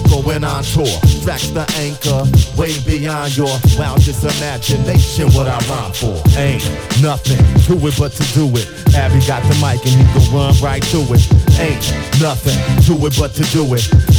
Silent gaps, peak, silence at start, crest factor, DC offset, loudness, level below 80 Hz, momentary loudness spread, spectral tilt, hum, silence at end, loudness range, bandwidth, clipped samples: none; 0 dBFS; 0 s; 12 dB; under 0.1%; -13 LUFS; -20 dBFS; 7 LU; -5.5 dB/octave; none; 0 s; 3 LU; over 20 kHz; under 0.1%